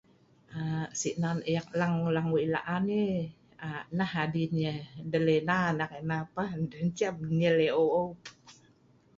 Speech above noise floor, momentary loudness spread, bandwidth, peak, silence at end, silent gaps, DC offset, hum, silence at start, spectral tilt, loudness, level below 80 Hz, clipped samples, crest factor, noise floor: 33 dB; 12 LU; 7.8 kHz; -12 dBFS; 0.65 s; none; under 0.1%; none; 0.5 s; -6 dB/octave; -30 LUFS; -64 dBFS; under 0.1%; 18 dB; -63 dBFS